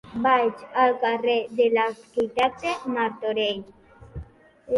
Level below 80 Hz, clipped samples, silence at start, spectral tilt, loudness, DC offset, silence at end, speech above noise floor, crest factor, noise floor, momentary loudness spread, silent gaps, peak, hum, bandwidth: -54 dBFS; under 0.1%; 0.05 s; -5 dB/octave; -24 LUFS; under 0.1%; 0 s; 23 dB; 16 dB; -46 dBFS; 14 LU; none; -8 dBFS; none; 11.5 kHz